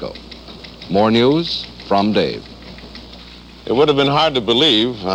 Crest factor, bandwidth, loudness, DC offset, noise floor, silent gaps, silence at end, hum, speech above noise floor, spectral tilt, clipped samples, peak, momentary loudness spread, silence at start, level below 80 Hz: 16 dB; 11.5 kHz; -15 LUFS; under 0.1%; -38 dBFS; none; 0 s; none; 23 dB; -5.5 dB/octave; under 0.1%; -2 dBFS; 22 LU; 0 s; -44 dBFS